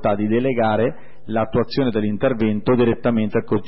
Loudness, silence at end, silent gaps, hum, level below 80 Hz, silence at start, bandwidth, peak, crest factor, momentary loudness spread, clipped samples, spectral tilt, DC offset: -20 LUFS; 0.05 s; none; none; -46 dBFS; 0 s; 5.8 kHz; -6 dBFS; 14 dB; 4 LU; under 0.1%; -12 dB/octave; 3%